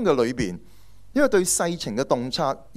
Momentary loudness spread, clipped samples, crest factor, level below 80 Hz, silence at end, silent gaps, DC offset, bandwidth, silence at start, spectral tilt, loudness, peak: 9 LU; under 0.1%; 18 dB; -50 dBFS; 0 s; none; under 0.1%; 16 kHz; 0 s; -4 dB/octave; -23 LUFS; -6 dBFS